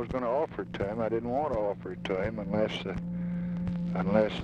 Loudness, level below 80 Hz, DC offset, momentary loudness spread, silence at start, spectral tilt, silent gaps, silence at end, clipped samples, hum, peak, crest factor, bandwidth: -31 LUFS; -50 dBFS; under 0.1%; 7 LU; 0 s; -8 dB/octave; none; 0 s; under 0.1%; none; -10 dBFS; 20 dB; 7.4 kHz